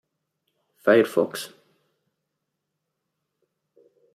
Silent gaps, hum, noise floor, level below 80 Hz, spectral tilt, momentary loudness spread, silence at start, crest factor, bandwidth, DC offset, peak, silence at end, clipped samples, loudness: none; none; -81 dBFS; -80 dBFS; -5 dB/octave; 17 LU; 0.85 s; 24 dB; 15.5 kHz; under 0.1%; -4 dBFS; 2.7 s; under 0.1%; -22 LUFS